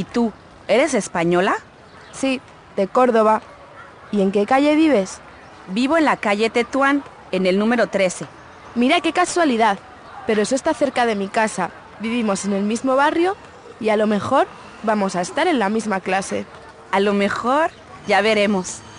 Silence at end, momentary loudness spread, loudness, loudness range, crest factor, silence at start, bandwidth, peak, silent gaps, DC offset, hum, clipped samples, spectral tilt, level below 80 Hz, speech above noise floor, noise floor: 0 s; 11 LU; -19 LUFS; 2 LU; 16 dB; 0 s; 10.5 kHz; -4 dBFS; none; under 0.1%; none; under 0.1%; -4.5 dB/octave; -56 dBFS; 23 dB; -41 dBFS